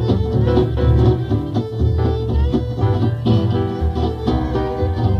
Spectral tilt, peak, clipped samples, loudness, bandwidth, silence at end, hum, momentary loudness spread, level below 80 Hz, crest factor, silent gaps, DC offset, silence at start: -9.5 dB/octave; -2 dBFS; under 0.1%; -18 LUFS; 6.2 kHz; 0 s; none; 5 LU; -24 dBFS; 14 dB; none; under 0.1%; 0 s